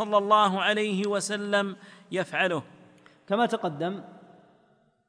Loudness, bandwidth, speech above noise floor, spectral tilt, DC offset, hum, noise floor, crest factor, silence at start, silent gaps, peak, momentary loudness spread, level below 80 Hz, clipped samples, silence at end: -26 LUFS; 10.5 kHz; 38 dB; -4 dB/octave; under 0.1%; none; -65 dBFS; 20 dB; 0 s; none; -8 dBFS; 12 LU; -80 dBFS; under 0.1%; 0.9 s